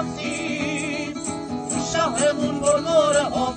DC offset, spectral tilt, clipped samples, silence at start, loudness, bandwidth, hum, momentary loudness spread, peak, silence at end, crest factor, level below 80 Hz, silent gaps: under 0.1%; -3.5 dB/octave; under 0.1%; 0 s; -22 LUFS; 9.6 kHz; none; 10 LU; -6 dBFS; 0 s; 16 dB; -50 dBFS; none